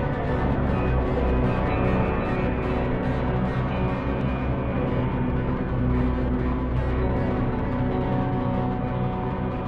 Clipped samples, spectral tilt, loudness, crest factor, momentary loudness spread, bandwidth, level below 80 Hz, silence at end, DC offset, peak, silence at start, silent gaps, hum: under 0.1%; -10 dB/octave; -25 LUFS; 14 dB; 3 LU; 5.2 kHz; -30 dBFS; 0 s; 0.4%; -10 dBFS; 0 s; none; none